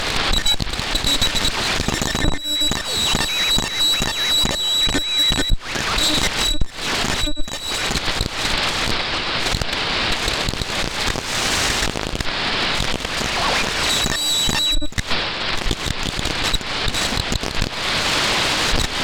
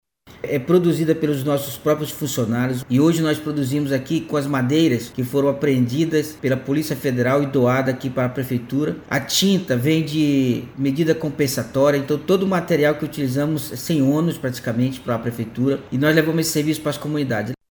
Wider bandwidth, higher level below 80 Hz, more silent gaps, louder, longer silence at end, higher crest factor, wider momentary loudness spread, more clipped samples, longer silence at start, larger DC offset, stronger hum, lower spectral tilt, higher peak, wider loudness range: about the same, over 20 kHz vs over 20 kHz; first, -30 dBFS vs -54 dBFS; neither; about the same, -19 LUFS vs -20 LUFS; second, 0 s vs 0.15 s; about the same, 18 dB vs 18 dB; about the same, 6 LU vs 6 LU; neither; second, 0 s vs 0.25 s; neither; neither; second, -2 dB/octave vs -5.5 dB/octave; about the same, -2 dBFS vs -2 dBFS; about the same, 3 LU vs 2 LU